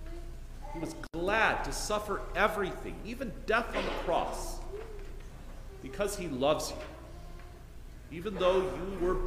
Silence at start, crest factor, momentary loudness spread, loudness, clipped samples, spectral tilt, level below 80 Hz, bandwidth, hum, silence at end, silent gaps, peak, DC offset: 0 s; 22 dB; 21 LU; -33 LUFS; under 0.1%; -4 dB/octave; -42 dBFS; 15.5 kHz; none; 0 s; none; -12 dBFS; under 0.1%